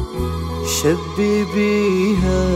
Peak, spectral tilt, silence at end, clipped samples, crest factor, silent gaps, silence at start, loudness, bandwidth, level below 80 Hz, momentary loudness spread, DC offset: -4 dBFS; -5.5 dB/octave; 0 s; under 0.1%; 14 dB; none; 0 s; -18 LUFS; 16 kHz; -30 dBFS; 7 LU; under 0.1%